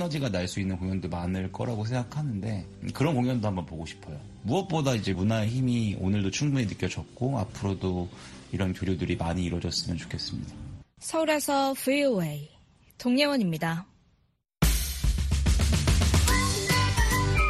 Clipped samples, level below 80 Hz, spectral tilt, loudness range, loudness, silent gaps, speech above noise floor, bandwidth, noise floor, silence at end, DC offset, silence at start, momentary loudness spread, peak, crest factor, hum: under 0.1%; -34 dBFS; -5 dB/octave; 4 LU; -28 LUFS; none; 41 dB; 13 kHz; -69 dBFS; 0 s; under 0.1%; 0 s; 13 LU; -10 dBFS; 18 dB; none